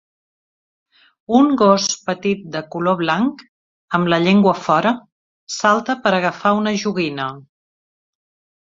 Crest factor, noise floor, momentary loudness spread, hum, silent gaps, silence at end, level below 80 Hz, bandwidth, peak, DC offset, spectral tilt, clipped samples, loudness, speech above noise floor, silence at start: 18 dB; under -90 dBFS; 9 LU; none; 3.49-3.88 s, 5.12-5.47 s; 1.25 s; -60 dBFS; 7.8 kHz; -2 dBFS; under 0.1%; -5 dB/octave; under 0.1%; -17 LUFS; over 73 dB; 1.3 s